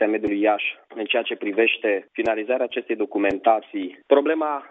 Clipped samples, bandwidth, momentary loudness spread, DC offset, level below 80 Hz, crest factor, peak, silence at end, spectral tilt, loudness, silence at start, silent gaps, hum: under 0.1%; 4.7 kHz; 6 LU; under 0.1%; -62 dBFS; 20 dB; -2 dBFS; 0.05 s; -1 dB/octave; -22 LUFS; 0 s; none; none